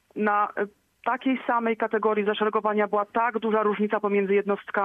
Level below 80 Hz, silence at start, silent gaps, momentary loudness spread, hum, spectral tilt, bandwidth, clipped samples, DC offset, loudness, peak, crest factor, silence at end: -74 dBFS; 0.15 s; none; 4 LU; none; -8 dB/octave; 3.9 kHz; under 0.1%; under 0.1%; -25 LUFS; -10 dBFS; 14 dB; 0 s